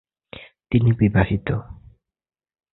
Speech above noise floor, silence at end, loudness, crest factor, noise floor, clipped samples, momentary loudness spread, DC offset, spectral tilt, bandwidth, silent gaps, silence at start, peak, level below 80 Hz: 33 dB; 0.95 s; -20 LUFS; 20 dB; -52 dBFS; under 0.1%; 23 LU; under 0.1%; -12.5 dB/octave; 4.1 kHz; none; 0.35 s; -2 dBFS; -40 dBFS